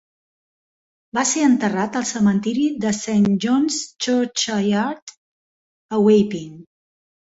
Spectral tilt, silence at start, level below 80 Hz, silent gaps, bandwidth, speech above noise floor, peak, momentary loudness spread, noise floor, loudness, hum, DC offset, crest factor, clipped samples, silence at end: -4.5 dB/octave; 1.15 s; -60 dBFS; 5.02-5.07 s, 5.17-5.89 s; 8 kHz; over 71 dB; -4 dBFS; 10 LU; under -90 dBFS; -19 LUFS; none; under 0.1%; 16 dB; under 0.1%; 0.75 s